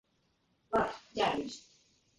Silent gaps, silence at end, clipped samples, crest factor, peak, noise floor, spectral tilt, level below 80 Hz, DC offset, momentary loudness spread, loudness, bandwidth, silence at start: none; 0.6 s; under 0.1%; 20 dB; -18 dBFS; -75 dBFS; -4 dB/octave; -64 dBFS; under 0.1%; 11 LU; -34 LUFS; 11.5 kHz; 0.7 s